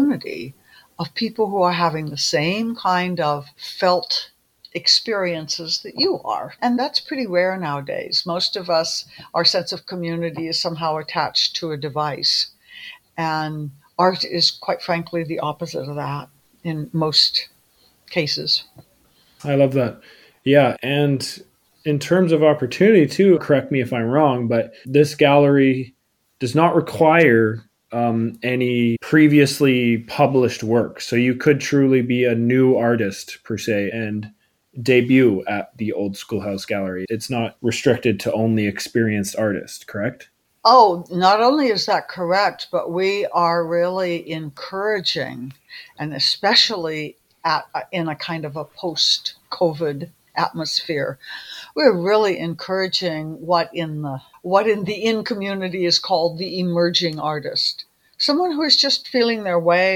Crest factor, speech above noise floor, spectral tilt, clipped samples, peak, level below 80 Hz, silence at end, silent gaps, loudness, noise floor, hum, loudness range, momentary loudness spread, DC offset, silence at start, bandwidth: 18 dB; 39 dB; -5 dB/octave; under 0.1%; 0 dBFS; -62 dBFS; 0 s; none; -19 LUFS; -58 dBFS; none; 5 LU; 14 LU; under 0.1%; 0 s; 18 kHz